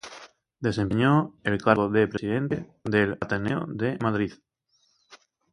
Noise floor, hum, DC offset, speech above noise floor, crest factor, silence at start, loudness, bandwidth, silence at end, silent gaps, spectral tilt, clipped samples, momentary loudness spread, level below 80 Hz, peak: -69 dBFS; none; under 0.1%; 45 dB; 24 dB; 0.05 s; -25 LUFS; 11 kHz; 0.35 s; none; -7.5 dB/octave; under 0.1%; 9 LU; -54 dBFS; -4 dBFS